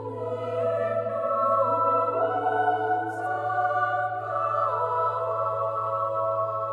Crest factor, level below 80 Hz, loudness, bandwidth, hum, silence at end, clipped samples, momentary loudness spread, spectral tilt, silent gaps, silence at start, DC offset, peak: 14 dB; -72 dBFS; -26 LUFS; 10.5 kHz; none; 0 s; under 0.1%; 5 LU; -7 dB/octave; none; 0 s; under 0.1%; -12 dBFS